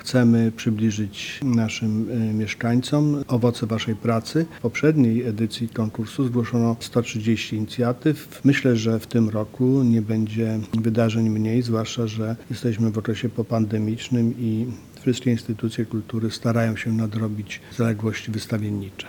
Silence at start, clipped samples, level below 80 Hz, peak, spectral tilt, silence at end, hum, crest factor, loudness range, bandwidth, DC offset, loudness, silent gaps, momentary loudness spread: 0 s; under 0.1%; -56 dBFS; -4 dBFS; -6.5 dB/octave; 0 s; none; 18 dB; 3 LU; 18.5 kHz; under 0.1%; -23 LUFS; none; 7 LU